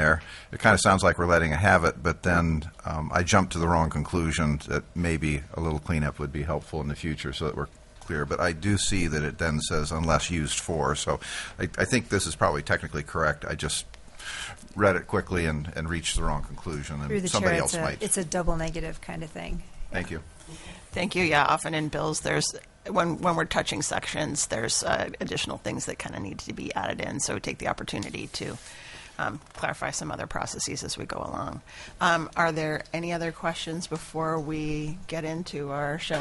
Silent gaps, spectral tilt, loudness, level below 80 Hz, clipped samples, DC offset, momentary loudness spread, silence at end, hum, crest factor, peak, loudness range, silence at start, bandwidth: none; -4 dB/octave; -27 LUFS; -42 dBFS; under 0.1%; under 0.1%; 13 LU; 0 s; none; 22 dB; -6 dBFS; 7 LU; 0 s; 11.5 kHz